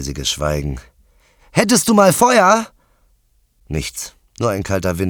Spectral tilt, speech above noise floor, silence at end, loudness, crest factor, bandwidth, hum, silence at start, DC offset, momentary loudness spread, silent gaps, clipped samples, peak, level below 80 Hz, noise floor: -4 dB/octave; 43 dB; 0 s; -16 LUFS; 18 dB; over 20 kHz; none; 0 s; under 0.1%; 17 LU; none; under 0.1%; 0 dBFS; -36 dBFS; -59 dBFS